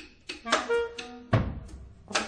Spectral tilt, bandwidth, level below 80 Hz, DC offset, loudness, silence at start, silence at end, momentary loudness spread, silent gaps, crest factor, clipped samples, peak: -4.5 dB/octave; 10 kHz; -44 dBFS; under 0.1%; -30 LUFS; 0 s; 0 s; 17 LU; none; 22 dB; under 0.1%; -10 dBFS